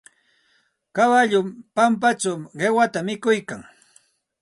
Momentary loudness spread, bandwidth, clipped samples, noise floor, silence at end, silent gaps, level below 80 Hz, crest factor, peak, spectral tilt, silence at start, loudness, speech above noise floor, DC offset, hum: 11 LU; 11.5 kHz; under 0.1%; -65 dBFS; 0.8 s; none; -68 dBFS; 18 dB; -6 dBFS; -4.5 dB/octave; 0.95 s; -20 LUFS; 45 dB; under 0.1%; none